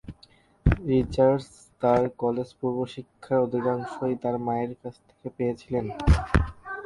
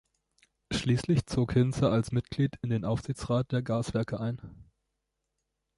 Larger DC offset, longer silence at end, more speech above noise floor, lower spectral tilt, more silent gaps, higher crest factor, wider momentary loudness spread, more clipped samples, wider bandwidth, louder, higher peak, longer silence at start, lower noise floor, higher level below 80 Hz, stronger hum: neither; second, 0 s vs 1.15 s; second, 32 dB vs 54 dB; about the same, -8 dB/octave vs -7 dB/octave; neither; first, 22 dB vs 16 dB; first, 17 LU vs 7 LU; neither; about the same, 11.5 kHz vs 11.5 kHz; first, -26 LUFS vs -30 LUFS; first, -4 dBFS vs -14 dBFS; second, 0.05 s vs 0.7 s; second, -58 dBFS vs -83 dBFS; first, -34 dBFS vs -50 dBFS; neither